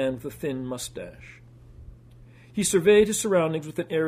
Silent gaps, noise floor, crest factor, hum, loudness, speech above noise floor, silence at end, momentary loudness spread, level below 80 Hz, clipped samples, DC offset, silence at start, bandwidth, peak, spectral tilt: none; -50 dBFS; 18 dB; none; -24 LUFS; 26 dB; 0 s; 17 LU; -52 dBFS; under 0.1%; under 0.1%; 0 s; 15.5 kHz; -8 dBFS; -4.5 dB/octave